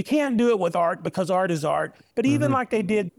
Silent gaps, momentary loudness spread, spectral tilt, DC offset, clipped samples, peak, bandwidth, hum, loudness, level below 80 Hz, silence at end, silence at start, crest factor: none; 5 LU; -6.5 dB/octave; under 0.1%; under 0.1%; -10 dBFS; 14.5 kHz; none; -23 LUFS; -62 dBFS; 0.1 s; 0 s; 12 dB